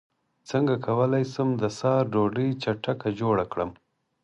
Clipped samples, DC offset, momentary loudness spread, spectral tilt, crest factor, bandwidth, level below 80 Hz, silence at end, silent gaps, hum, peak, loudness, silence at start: under 0.1%; under 0.1%; 6 LU; -7.5 dB/octave; 16 dB; 10.5 kHz; -58 dBFS; 0.5 s; none; none; -10 dBFS; -26 LUFS; 0.45 s